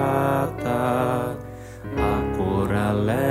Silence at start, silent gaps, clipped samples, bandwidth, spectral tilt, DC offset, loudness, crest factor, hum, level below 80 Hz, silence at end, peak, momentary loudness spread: 0 s; none; under 0.1%; 16 kHz; -7.5 dB/octave; under 0.1%; -23 LUFS; 14 dB; none; -38 dBFS; 0 s; -8 dBFS; 10 LU